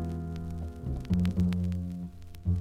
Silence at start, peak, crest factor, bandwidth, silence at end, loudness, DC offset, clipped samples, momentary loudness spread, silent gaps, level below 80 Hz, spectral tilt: 0 s; -16 dBFS; 14 dB; 11 kHz; 0 s; -33 LUFS; under 0.1%; under 0.1%; 10 LU; none; -42 dBFS; -8.5 dB/octave